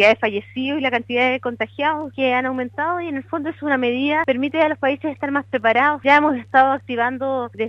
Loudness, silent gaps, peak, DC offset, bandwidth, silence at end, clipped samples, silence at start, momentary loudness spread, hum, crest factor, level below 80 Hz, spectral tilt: -19 LUFS; none; -2 dBFS; under 0.1%; 8.2 kHz; 0 s; under 0.1%; 0 s; 9 LU; none; 18 dB; -62 dBFS; -6 dB/octave